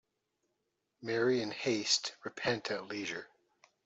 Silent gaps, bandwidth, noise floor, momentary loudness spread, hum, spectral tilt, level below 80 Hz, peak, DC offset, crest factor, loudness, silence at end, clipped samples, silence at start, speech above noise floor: none; 8.2 kHz; -83 dBFS; 11 LU; none; -3 dB/octave; -76 dBFS; -14 dBFS; under 0.1%; 22 dB; -34 LUFS; 0.6 s; under 0.1%; 1 s; 49 dB